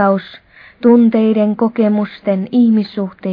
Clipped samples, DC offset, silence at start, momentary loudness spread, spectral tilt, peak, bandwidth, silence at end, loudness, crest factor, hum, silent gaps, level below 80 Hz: under 0.1%; under 0.1%; 0 s; 9 LU; -10.5 dB/octave; 0 dBFS; 5 kHz; 0 s; -14 LUFS; 12 dB; none; none; -58 dBFS